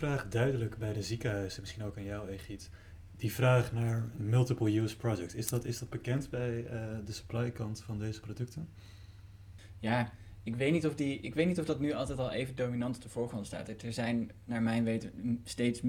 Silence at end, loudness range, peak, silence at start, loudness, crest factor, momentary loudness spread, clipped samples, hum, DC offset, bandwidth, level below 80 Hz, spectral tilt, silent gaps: 0 s; 6 LU; -12 dBFS; 0 s; -35 LUFS; 22 dB; 15 LU; under 0.1%; none; under 0.1%; 17.5 kHz; -56 dBFS; -6.5 dB/octave; none